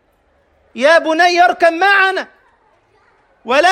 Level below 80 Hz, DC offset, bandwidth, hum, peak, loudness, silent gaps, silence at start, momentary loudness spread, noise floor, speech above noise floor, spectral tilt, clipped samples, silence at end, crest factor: -60 dBFS; under 0.1%; 14 kHz; none; 0 dBFS; -12 LUFS; none; 0.75 s; 13 LU; -57 dBFS; 45 dB; -1.5 dB/octave; under 0.1%; 0 s; 14 dB